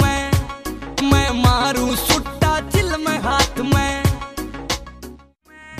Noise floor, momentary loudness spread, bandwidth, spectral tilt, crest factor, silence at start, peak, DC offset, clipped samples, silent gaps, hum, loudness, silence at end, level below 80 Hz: -46 dBFS; 13 LU; 15.5 kHz; -4.5 dB/octave; 18 dB; 0 s; 0 dBFS; under 0.1%; under 0.1%; none; none; -19 LUFS; 0 s; -28 dBFS